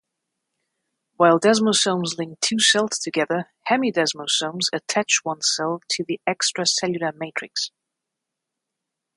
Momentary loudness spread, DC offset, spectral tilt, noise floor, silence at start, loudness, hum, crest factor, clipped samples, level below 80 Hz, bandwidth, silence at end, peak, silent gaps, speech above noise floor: 10 LU; under 0.1%; -2.5 dB/octave; -83 dBFS; 1.2 s; -21 LUFS; none; 20 dB; under 0.1%; -72 dBFS; 11.5 kHz; 1.5 s; -2 dBFS; none; 61 dB